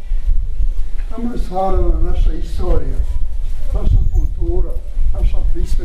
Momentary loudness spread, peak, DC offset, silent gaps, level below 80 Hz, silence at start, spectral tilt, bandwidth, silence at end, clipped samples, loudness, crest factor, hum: 7 LU; -2 dBFS; under 0.1%; none; -14 dBFS; 0 s; -8.5 dB/octave; 4.3 kHz; 0 s; under 0.1%; -22 LUFS; 10 dB; none